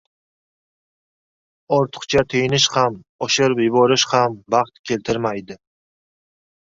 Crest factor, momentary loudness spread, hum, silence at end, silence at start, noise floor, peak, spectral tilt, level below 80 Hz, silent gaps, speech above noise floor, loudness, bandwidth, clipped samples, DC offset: 20 dB; 9 LU; none; 1.1 s; 1.7 s; under -90 dBFS; -2 dBFS; -4 dB/octave; -54 dBFS; 3.09-3.19 s, 4.79-4.84 s; over 72 dB; -18 LUFS; 7.8 kHz; under 0.1%; under 0.1%